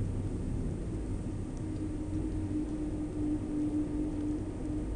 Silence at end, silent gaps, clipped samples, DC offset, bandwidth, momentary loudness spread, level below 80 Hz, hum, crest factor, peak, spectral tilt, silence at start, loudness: 0 s; none; under 0.1%; under 0.1%; 10 kHz; 4 LU; -40 dBFS; none; 12 dB; -22 dBFS; -8.5 dB/octave; 0 s; -36 LUFS